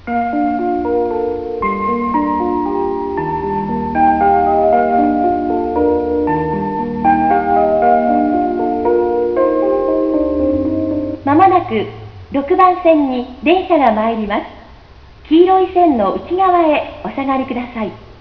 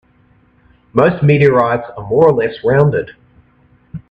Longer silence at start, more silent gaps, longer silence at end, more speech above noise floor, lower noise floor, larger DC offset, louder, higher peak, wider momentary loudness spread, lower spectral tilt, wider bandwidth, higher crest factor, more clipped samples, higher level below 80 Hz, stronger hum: second, 0.05 s vs 0.95 s; neither; about the same, 0.1 s vs 0.1 s; second, 26 dB vs 40 dB; second, -40 dBFS vs -52 dBFS; first, 0.3% vs under 0.1%; about the same, -15 LUFS vs -13 LUFS; about the same, 0 dBFS vs 0 dBFS; second, 8 LU vs 15 LU; about the same, -9 dB/octave vs -9.5 dB/octave; about the same, 5.4 kHz vs 5.2 kHz; about the same, 14 dB vs 14 dB; neither; first, -38 dBFS vs -46 dBFS; neither